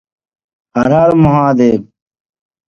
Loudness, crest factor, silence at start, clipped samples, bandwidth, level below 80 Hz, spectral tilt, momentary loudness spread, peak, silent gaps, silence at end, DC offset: -11 LUFS; 14 dB; 0.75 s; under 0.1%; 7 kHz; -40 dBFS; -9 dB/octave; 9 LU; 0 dBFS; none; 0.85 s; under 0.1%